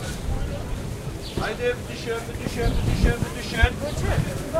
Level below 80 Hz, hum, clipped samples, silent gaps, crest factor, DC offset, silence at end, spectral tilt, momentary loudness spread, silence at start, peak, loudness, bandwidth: -30 dBFS; none; under 0.1%; none; 22 dB; under 0.1%; 0 s; -5.5 dB/octave; 9 LU; 0 s; -2 dBFS; -26 LUFS; 16 kHz